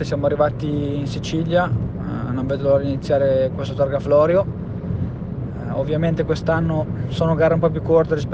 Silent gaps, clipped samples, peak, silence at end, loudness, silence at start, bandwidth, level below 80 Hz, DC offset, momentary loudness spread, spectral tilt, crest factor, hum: none; under 0.1%; -4 dBFS; 0 s; -20 LUFS; 0 s; 8 kHz; -38 dBFS; under 0.1%; 9 LU; -8 dB/octave; 16 dB; none